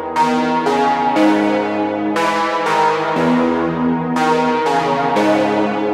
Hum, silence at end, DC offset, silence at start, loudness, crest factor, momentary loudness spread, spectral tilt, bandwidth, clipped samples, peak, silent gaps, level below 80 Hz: none; 0 s; under 0.1%; 0 s; -16 LUFS; 12 dB; 3 LU; -5.5 dB/octave; 14 kHz; under 0.1%; -2 dBFS; none; -54 dBFS